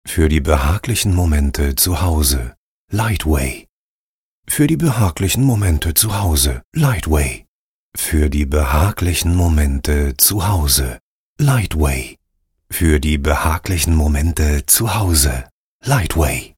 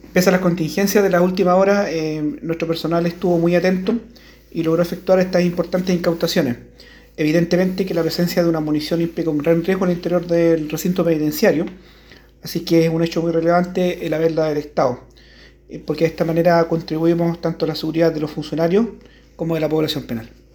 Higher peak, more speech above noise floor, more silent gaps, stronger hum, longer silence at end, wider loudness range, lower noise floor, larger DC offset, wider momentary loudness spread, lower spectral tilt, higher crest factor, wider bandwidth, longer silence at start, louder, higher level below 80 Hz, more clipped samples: about the same, 0 dBFS vs -2 dBFS; first, over 75 dB vs 28 dB; first, 2.57-2.88 s, 3.69-4.43 s, 6.64-6.72 s, 7.48-7.92 s, 11.01-11.36 s, 15.51-15.80 s vs none; neither; second, 0.1 s vs 0.25 s; about the same, 3 LU vs 2 LU; first, under -90 dBFS vs -46 dBFS; neither; about the same, 9 LU vs 9 LU; second, -4.5 dB/octave vs -6.5 dB/octave; about the same, 16 dB vs 16 dB; second, 17.5 kHz vs over 20 kHz; about the same, 0.05 s vs 0.05 s; about the same, -16 LUFS vs -18 LUFS; first, -22 dBFS vs -48 dBFS; neither